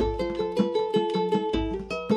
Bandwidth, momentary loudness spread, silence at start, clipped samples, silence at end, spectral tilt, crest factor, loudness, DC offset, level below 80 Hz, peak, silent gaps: 10.5 kHz; 4 LU; 0 s; under 0.1%; 0 s; -7 dB/octave; 16 dB; -27 LUFS; under 0.1%; -40 dBFS; -10 dBFS; none